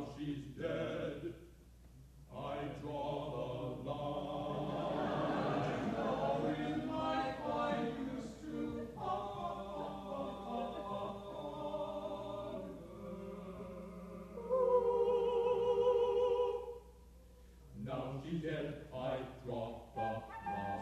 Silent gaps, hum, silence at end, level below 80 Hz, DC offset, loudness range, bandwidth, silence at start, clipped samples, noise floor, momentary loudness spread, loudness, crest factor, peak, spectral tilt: none; none; 0 s; -60 dBFS; under 0.1%; 9 LU; 13 kHz; 0 s; under 0.1%; -59 dBFS; 15 LU; -39 LUFS; 18 dB; -20 dBFS; -7 dB/octave